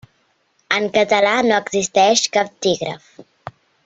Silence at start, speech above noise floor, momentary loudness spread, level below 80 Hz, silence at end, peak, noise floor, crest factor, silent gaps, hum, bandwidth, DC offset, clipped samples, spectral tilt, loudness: 0.7 s; 46 dB; 24 LU; -60 dBFS; 0.65 s; -2 dBFS; -63 dBFS; 18 dB; none; none; 8.2 kHz; under 0.1%; under 0.1%; -2.5 dB/octave; -17 LUFS